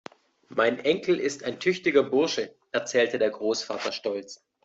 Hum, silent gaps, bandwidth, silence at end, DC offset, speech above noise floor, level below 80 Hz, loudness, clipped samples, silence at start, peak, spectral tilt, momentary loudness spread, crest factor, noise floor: none; none; 8 kHz; 0.3 s; under 0.1%; 22 dB; -70 dBFS; -26 LUFS; under 0.1%; 0.5 s; -8 dBFS; -3.5 dB/octave; 9 LU; 20 dB; -48 dBFS